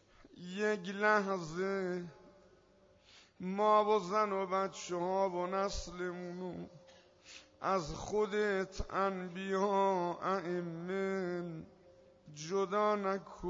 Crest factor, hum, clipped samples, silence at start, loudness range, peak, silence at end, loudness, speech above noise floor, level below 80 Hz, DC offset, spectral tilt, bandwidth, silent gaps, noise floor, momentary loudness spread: 20 dB; none; under 0.1%; 0.35 s; 4 LU; -18 dBFS; 0 s; -35 LUFS; 31 dB; -58 dBFS; under 0.1%; -4 dB/octave; 7.4 kHz; none; -66 dBFS; 15 LU